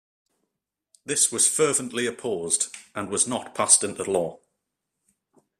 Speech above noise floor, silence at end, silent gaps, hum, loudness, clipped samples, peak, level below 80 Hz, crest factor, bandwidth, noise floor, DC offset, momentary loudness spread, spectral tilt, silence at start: 59 dB; 1.25 s; none; none; -22 LUFS; under 0.1%; -2 dBFS; -68 dBFS; 24 dB; 15.5 kHz; -83 dBFS; under 0.1%; 12 LU; -1.5 dB/octave; 1.05 s